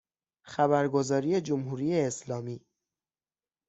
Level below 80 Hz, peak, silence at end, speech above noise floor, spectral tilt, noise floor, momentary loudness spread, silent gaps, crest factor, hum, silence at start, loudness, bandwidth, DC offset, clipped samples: -70 dBFS; -10 dBFS; 1.1 s; over 62 dB; -6 dB/octave; under -90 dBFS; 13 LU; none; 20 dB; none; 0.45 s; -29 LUFS; 8.2 kHz; under 0.1%; under 0.1%